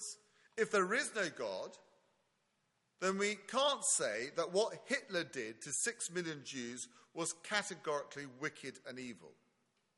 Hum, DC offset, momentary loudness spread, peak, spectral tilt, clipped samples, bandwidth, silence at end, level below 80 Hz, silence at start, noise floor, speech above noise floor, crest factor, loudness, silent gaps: none; under 0.1%; 15 LU; -18 dBFS; -2 dB/octave; under 0.1%; 11.5 kHz; 0.65 s; -86 dBFS; 0 s; -81 dBFS; 42 dB; 22 dB; -38 LUFS; none